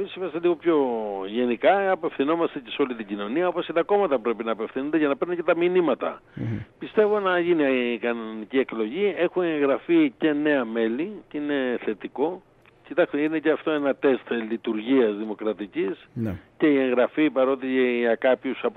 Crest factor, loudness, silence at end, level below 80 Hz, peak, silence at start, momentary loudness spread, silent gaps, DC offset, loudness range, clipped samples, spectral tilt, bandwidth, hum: 16 dB; -24 LUFS; 0.05 s; -64 dBFS; -8 dBFS; 0 s; 9 LU; none; under 0.1%; 2 LU; under 0.1%; -9 dB/octave; 4.2 kHz; none